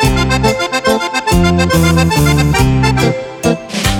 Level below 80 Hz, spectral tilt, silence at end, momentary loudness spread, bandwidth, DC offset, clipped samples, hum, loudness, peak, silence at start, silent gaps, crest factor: -22 dBFS; -5 dB/octave; 0 s; 5 LU; 18.5 kHz; under 0.1%; under 0.1%; none; -12 LUFS; 0 dBFS; 0 s; none; 12 dB